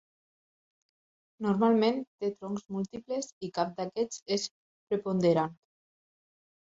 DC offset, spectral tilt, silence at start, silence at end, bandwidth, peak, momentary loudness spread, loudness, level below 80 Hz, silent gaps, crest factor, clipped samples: under 0.1%; -5.5 dB/octave; 1.4 s; 1.1 s; 8 kHz; -14 dBFS; 11 LU; -31 LUFS; -72 dBFS; 2.07-2.18 s, 3.32-3.41 s, 4.22-4.26 s, 4.51-4.87 s; 20 dB; under 0.1%